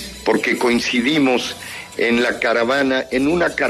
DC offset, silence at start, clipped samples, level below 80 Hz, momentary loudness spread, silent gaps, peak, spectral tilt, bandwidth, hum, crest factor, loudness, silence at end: under 0.1%; 0 s; under 0.1%; -48 dBFS; 5 LU; none; -4 dBFS; -4 dB/octave; 13.5 kHz; none; 14 dB; -17 LUFS; 0 s